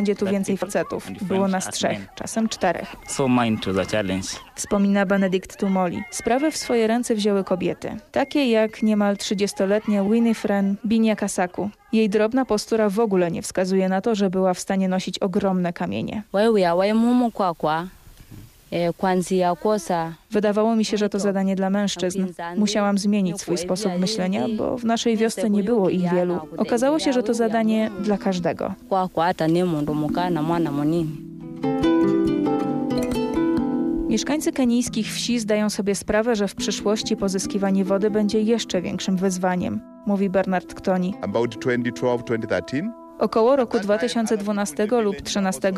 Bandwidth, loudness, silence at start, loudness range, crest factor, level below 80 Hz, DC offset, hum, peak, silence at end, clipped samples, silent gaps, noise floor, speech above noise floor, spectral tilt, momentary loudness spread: 14.5 kHz; -22 LUFS; 0 s; 2 LU; 12 dB; -52 dBFS; under 0.1%; none; -10 dBFS; 0 s; under 0.1%; none; -44 dBFS; 23 dB; -5.5 dB/octave; 6 LU